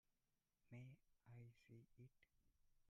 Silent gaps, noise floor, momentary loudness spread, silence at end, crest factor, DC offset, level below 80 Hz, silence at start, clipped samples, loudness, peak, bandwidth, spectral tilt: none; under -90 dBFS; 6 LU; 0 s; 18 dB; under 0.1%; -86 dBFS; 0.1 s; under 0.1%; -66 LUFS; -48 dBFS; 7 kHz; -7.5 dB/octave